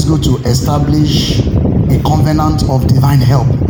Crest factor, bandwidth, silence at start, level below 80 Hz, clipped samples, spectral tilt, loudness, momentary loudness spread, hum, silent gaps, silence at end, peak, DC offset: 10 dB; 17.5 kHz; 0 s; -22 dBFS; under 0.1%; -6.5 dB/octave; -11 LUFS; 3 LU; none; none; 0 s; 0 dBFS; under 0.1%